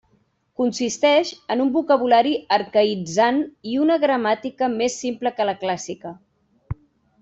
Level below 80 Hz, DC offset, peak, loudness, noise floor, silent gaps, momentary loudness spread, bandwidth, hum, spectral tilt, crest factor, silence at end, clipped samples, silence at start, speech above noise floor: -56 dBFS; under 0.1%; -6 dBFS; -20 LUFS; -64 dBFS; none; 17 LU; 8.2 kHz; none; -4 dB/octave; 16 dB; 0.5 s; under 0.1%; 0.6 s; 44 dB